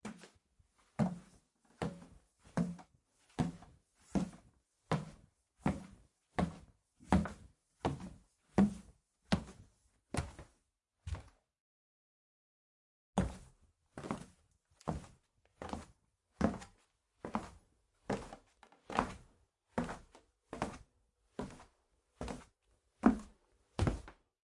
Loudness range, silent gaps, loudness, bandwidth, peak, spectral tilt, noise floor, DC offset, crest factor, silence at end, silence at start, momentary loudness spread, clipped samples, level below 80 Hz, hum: 9 LU; 11.60-13.13 s; -40 LUFS; 11.5 kHz; -12 dBFS; -6.5 dB/octave; -82 dBFS; under 0.1%; 30 dB; 0.45 s; 0.05 s; 22 LU; under 0.1%; -56 dBFS; none